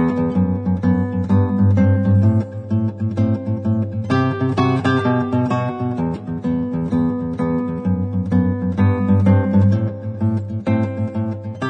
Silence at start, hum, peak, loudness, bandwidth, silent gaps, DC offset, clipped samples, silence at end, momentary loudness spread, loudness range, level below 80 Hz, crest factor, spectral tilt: 0 s; none; -2 dBFS; -19 LUFS; 6.2 kHz; none; under 0.1%; under 0.1%; 0 s; 7 LU; 3 LU; -46 dBFS; 16 dB; -9.5 dB/octave